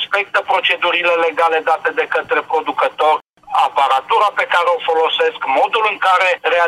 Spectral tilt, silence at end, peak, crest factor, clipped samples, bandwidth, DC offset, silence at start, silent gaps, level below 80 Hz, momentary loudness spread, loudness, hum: -1.5 dB/octave; 0 s; -2 dBFS; 14 dB; under 0.1%; 13.5 kHz; under 0.1%; 0 s; 3.29-3.33 s; -68 dBFS; 4 LU; -15 LUFS; none